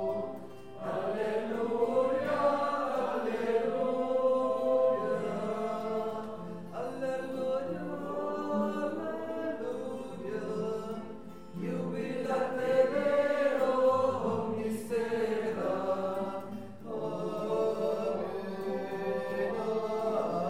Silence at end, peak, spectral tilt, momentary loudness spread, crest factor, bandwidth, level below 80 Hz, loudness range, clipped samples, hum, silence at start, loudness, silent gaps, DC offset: 0 s; -14 dBFS; -6.5 dB/octave; 11 LU; 18 dB; 15.5 kHz; -66 dBFS; 6 LU; under 0.1%; none; 0 s; -32 LUFS; none; 0.4%